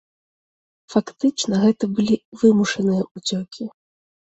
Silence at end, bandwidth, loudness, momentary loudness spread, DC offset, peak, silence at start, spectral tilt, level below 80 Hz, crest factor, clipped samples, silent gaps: 0.55 s; 8.2 kHz; -20 LUFS; 11 LU; under 0.1%; -4 dBFS; 0.9 s; -5.5 dB/octave; -60 dBFS; 18 dB; under 0.1%; 2.25-2.32 s, 3.11-3.15 s